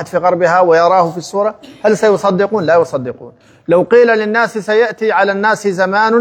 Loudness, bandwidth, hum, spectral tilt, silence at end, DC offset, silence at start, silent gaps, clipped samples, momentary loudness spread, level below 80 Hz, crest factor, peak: -12 LUFS; 12 kHz; none; -5.5 dB/octave; 0 s; under 0.1%; 0 s; none; under 0.1%; 8 LU; -60 dBFS; 12 dB; 0 dBFS